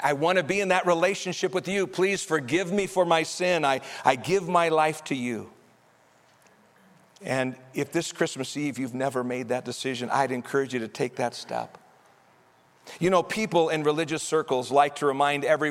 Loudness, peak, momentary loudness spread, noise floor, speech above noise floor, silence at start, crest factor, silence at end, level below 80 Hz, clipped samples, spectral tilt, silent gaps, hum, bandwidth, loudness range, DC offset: -26 LUFS; -4 dBFS; 8 LU; -60 dBFS; 34 dB; 0 s; 22 dB; 0 s; -68 dBFS; under 0.1%; -4.5 dB/octave; none; none; 16 kHz; 7 LU; under 0.1%